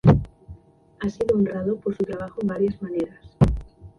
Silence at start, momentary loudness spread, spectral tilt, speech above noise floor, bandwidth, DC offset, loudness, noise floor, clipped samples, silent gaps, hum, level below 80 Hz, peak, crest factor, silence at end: 0.05 s; 9 LU; -9.5 dB/octave; 24 dB; 10 kHz; under 0.1%; -25 LUFS; -47 dBFS; under 0.1%; none; none; -36 dBFS; -2 dBFS; 22 dB; 0.1 s